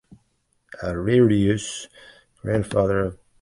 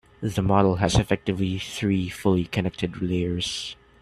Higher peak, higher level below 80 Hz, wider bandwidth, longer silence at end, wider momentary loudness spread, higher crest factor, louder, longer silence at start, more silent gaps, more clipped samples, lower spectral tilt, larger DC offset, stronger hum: about the same, -6 dBFS vs -4 dBFS; about the same, -44 dBFS vs -42 dBFS; second, 11.5 kHz vs 14 kHz; about the same, 0.3 s vs 0.25 s; first, 17 LU vs 8 LU; about the same, 18 dB vs 20 dB; about the same, -22 LUFS vs -24 LUFS; first, 0.8 s vs 0.2 s; neither; neither; about the same, -6.5 dB/octave vs -6 dB/octave; neither; neither